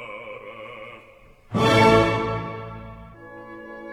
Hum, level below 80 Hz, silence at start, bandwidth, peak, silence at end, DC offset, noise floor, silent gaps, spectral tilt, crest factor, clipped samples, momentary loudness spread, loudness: none; -44 dBFS; 0 s; 15.5 kHz; -2 dBFS; 0 s; under 0.1%; -50 dBFS; none; -6 dB/octave; 22 dB; under 0.1%; 26 LU; -20 LUFS